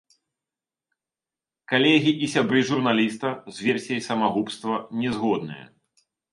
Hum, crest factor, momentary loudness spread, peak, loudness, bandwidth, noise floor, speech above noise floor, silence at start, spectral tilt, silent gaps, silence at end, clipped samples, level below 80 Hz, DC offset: none; 20 dB; 10 LU; -4 dBFS; -23 LUFS; 11.5 kHz; under -90 dBFS; over 67 dB; 1.7 s; -5 dB/octave; none; 0.7 s; under 0.1%; -66 dBFS; under 0.1%